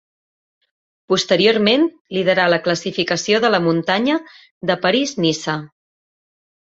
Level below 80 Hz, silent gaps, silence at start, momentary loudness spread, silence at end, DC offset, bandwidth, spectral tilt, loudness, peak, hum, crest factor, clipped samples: -62 dBFS; 2.01-2.05 s, 4.51-4.61 s; 1.1 s; 8 LU; 1.1 s; under 0.1%; 8 kHz; -4.5 dB/octave; -17 LUFS; -2 dBFS; none; 18 dB; under 0.1%